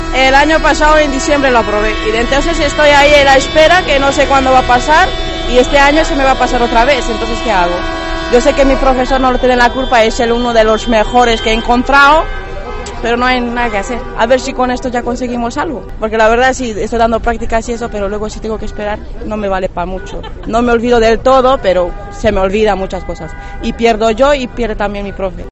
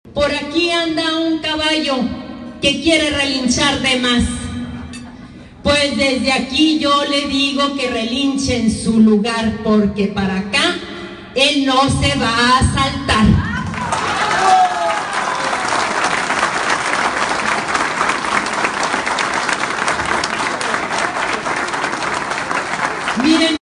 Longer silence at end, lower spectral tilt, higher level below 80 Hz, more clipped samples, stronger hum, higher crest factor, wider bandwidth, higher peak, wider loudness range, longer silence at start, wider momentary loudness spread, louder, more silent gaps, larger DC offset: second, 0 s vs 0.15 s; about the same, -4 dB/octave vs -4 dB/octave; first, -22 dBFS vs -34 dBFS; first, 0.3% vs under 0.1%; neither; second, 10 dB vs 16 dB; about the same, 10 kHz vs 10.5 kHz; about the same, 0 dBFS vs 0 dBFS; first, 6 LU vs 3 LU; about the same, 0 s vs 0.05 s; first, 13 LU vs 7 LU; first, -11 LUFS vs -16 LUFS; neither; neither